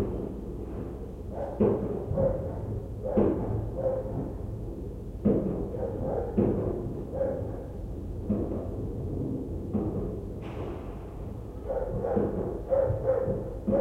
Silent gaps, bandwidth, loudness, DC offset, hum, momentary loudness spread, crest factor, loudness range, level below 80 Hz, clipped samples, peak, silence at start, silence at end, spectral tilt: none; 12 kHz; -31 LUFS; under 0.1%; none; 11 LU; 18 dB; 4 LU; -40 dBFS; under 0.1%; -12 dBFS; 0 s; 0 s; -10.5 dB/octave